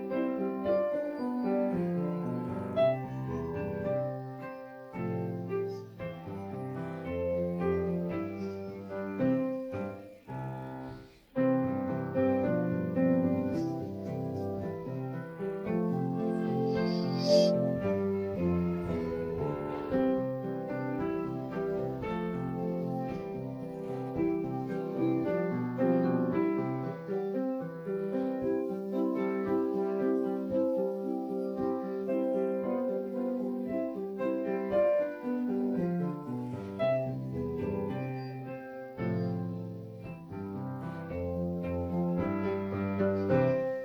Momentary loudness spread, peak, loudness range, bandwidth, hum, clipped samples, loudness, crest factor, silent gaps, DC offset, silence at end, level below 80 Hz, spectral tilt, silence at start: 10 LU; -12 dBFS; 6 LU; 18 kHz; none; under 0.1%; -33 LUFS; 20 dB; none; under 0.1%; 0 s; -60 dBFS; -8.5 dB/octave; 0 s